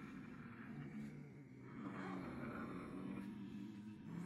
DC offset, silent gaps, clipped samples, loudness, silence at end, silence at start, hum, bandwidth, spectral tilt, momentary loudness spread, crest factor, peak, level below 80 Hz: under 0.1%; none; under 0.1%; -52 LUFS; 0 s; 0 s; none; 13 kHz; -7.5 dB/octave; 7 LU; 16 dB; -36 dBFS; -74 dBFS